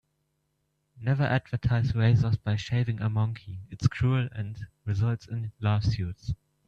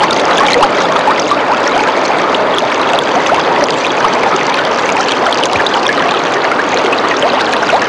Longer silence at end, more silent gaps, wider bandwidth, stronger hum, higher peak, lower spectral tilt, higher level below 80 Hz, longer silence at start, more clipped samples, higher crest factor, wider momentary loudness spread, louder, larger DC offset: first, 0.35 s vs 0 s; neither; second, 7.2 kHz vs 11.5 kHz; neither; second, -10 dBFS vs 0 dBFS; first, -7.5 dB/octave vs -3 dB/octave; about the same, -48 dBFS vs -48 dBFS; first, 0.95 s vs 0 s; neither; first, 18 dB vs 10 dB; first, 13 LU vs 2 LU; second, -28 LUFS vs -11 LUFS; neither